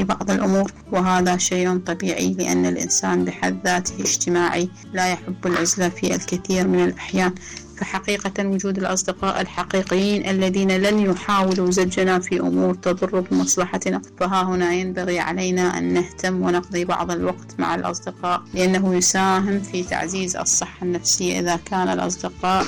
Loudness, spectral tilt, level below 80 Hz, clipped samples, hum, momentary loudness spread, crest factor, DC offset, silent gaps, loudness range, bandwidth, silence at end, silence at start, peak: -21 LUFS; -4 dB/octave; -48 dBFS; under 0.1%; none; 6 LU; 10 dB; under 0.1%; none; 3 LU; 18 kHz; 0 s; 0 s; -10 dBFS